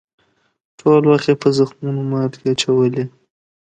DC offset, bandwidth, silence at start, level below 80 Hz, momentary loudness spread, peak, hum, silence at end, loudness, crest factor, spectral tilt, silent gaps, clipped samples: under 0.1%; 9.2 kHz; 0.85 s; -60 dBFS; 9 LU; 0 dBFS; none; 0.7 s; -17 LUFS; 16 dB; -6.5 dB/octave; none; under 0.1%